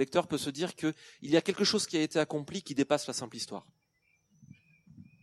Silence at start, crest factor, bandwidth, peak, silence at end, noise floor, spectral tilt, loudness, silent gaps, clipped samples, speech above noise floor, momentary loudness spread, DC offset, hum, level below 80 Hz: 0 s; 22 dB; 13.5 kHz; -12 dBFS; 0.2 s; -74 dBFS; -4 dB/octave; -31 LUFS; none; under 0.1%; 42 dB; 11 LU; under 0.1%; none; -74 dBFS